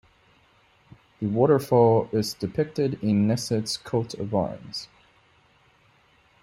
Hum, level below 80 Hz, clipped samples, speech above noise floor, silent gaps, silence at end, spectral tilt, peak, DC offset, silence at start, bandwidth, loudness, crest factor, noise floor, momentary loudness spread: none; -60 dBFS; under 0.1%; 37 dB; none; 1.55 s; -6.5 dB/octave; -6 dBFS; under 0.1%; 1.2 s; 16 kHz; -24 LUFS; 20 dB; -61 dBFS; 14 LU